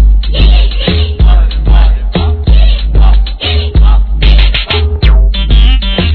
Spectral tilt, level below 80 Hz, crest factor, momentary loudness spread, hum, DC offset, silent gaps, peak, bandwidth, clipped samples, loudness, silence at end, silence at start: -8.5 dB/octave; -6 dBFS; 6 dB; 3 LU; none; under 0.1%; none; 0 dBFS; 4.5 kHz; 3%; -10 LUFS; 0 s; 0 s